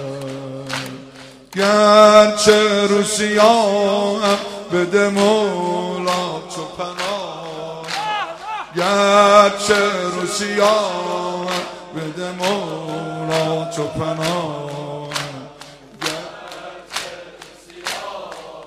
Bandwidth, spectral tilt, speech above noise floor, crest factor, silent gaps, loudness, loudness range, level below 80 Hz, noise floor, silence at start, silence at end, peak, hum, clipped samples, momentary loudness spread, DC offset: 15.5 kHz; -3.5 dB/octave; 25 dB; 18 dB; none; -17 LUFS; 12 LU; -56 dBFS; -40 dBFS; 0 s; 0 s; 0 dBFS; none; under 0.1%; 17 LU; under 0.1%